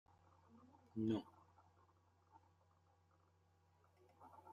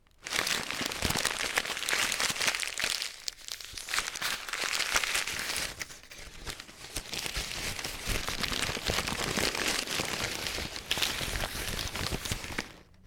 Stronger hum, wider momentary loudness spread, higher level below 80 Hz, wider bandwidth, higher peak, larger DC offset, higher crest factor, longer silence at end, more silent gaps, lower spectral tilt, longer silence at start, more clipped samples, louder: neither; first, 24 LU vs 11 LU; second, -88 dBFS vs -46 dBFS; second, 7.4 kHz vs 19 kHz; second, -30 dBFS vs -10 dBFS; neither; about the same, 22 dB vs 24 dB; about the same, 0 s vs 0.05 s; neither; first, -8.5 dB/octave vs -1.5 dB/octave; first, 0.55 s vs 0.2 s; neither; second, -45 LUFS vs -31 LUFS